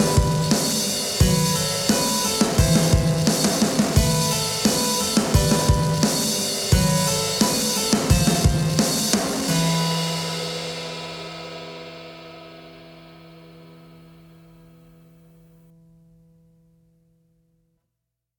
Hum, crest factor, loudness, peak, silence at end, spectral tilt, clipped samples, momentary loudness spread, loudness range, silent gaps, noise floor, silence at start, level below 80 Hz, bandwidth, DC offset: none; 22 dB; -20 LUFS; 0 dBFS; 4.65 s; -4 dB/octave; under 0.1%; 15 LU; 14 LU; none; -81 dBFS; 0 s; -34 dBFS; 18 kHz; under 0.1%